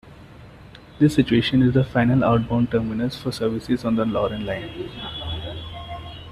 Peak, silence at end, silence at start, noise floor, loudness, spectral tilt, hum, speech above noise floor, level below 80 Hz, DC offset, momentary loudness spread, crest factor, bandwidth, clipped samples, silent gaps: -4 dBFS; 0 s; 0.05 s; -44 dBFS; -22 LUFS; -7.5 dB/octave; none; 23 dB; -44 dBFS; under 0.1%; 15 LU; 18 dB; 13 kHz; under 0.1%; none